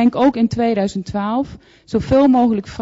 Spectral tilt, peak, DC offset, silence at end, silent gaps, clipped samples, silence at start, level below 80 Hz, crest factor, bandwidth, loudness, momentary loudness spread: -7.5 dB/octave; -4 dBFS; under 0.1%; 0 s; none; under 0.1%; 0 s; -42 dBFS; 12 dB; 7.8 kHz; -17 LUFS; 10 LU